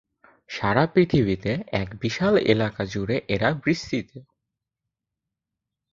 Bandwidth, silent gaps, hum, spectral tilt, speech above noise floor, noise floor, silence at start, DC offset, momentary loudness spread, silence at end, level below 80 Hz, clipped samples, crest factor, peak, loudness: 7.6 kHz; none; none; -6.5 dB/octave; 62 dB; -85 dBFS; 0.5 s; under 0.1%; 9 LU; 1.7 s; -50 dBFS; under 0.1%; 22 dB; -4 dBFS; -23 LUFS